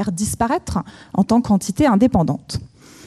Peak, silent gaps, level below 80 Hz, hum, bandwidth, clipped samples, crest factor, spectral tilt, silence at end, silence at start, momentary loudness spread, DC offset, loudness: -4 dBFS; none; -42 dBFS; none; 14 kHz; under 0.1%; 16 dB; -6 dB/octave; 0 s; 0 s; 11 LU; under 0.1%; -18 LUFS